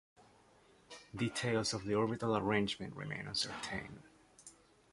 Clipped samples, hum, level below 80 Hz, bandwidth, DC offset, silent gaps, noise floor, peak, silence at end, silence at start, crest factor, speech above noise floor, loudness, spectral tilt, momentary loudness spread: under 0.1%; none; -66 dBFS; 11.5 kHz; under 0.1%; none; -66 dBFS; -18 dBFS; 0.4 s; 0.2 s; 22 dB; 29 dB; -37 LUFS; -4.5 dB/octave; 23 LU